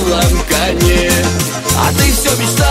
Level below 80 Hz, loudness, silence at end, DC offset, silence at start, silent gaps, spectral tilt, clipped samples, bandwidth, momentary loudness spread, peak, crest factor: -20 dBFS; -12 LUFS; 0 s; under 0.1%; 0 s; none; -4 dB/octave; under 0.1%; 16.5 kHz; 3 LU; 0 dBFS; 12 dB